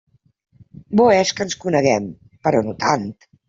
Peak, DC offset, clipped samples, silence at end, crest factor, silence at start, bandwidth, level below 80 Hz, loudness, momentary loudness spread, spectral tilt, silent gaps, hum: -2 dBFS; under 0.1%; under 0.1%; 0.35 s; 18 dB; 0.9 s; 7.8 kHz; -56 dBFS; -18 LUFS; 10 LU; -5 dB/octave; none; none